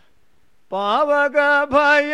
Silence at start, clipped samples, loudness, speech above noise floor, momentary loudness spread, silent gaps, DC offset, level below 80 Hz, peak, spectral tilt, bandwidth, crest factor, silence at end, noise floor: 0.7 s; under 0.1%; -17 LUFS; 47 dB; 9 LU; none; 0.3%; -54 dBFS; -4 dBFS; -4 dB/octave; 10.5 kHz; 14 dB; 0 s; -63 dBFS